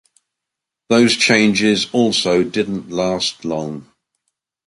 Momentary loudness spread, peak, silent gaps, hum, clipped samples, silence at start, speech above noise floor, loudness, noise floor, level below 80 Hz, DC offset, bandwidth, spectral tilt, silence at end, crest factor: 12 LU; -2 dBFS; none; none; under 0.1%; 0.9 s; 67 dB; -16 LUFS; -83 dBFS; -54 dBFS; under 0.1%; 11.5 kHz; -4 dB/octave; 0.85 s; 16 dB